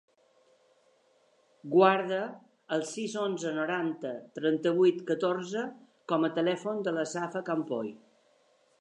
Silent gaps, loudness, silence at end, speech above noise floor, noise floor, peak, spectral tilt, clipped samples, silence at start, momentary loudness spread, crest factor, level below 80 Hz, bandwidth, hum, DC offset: none; -30 LUFS; 0.85 s; 38 dB; -67 dBFS; -8 dBFS; -5.5 dB/octave; under 0.1%; 1.65 s; 13 LU; 24 dB; -88 dBFS; 11 kHz; none; under 0.1%